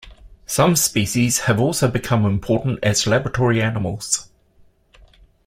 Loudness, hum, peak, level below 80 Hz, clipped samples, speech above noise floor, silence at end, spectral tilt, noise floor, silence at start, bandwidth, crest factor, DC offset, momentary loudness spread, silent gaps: -19 LUFS; none; 0 dBFS; -44 dBFS; under 0.1%; 36 dB; 1.25 s; -4.5 dB/octave; -54 dBFS; 0.05 s; 16.5 kHz; 20 dB; under 0.1%; 6 LU; none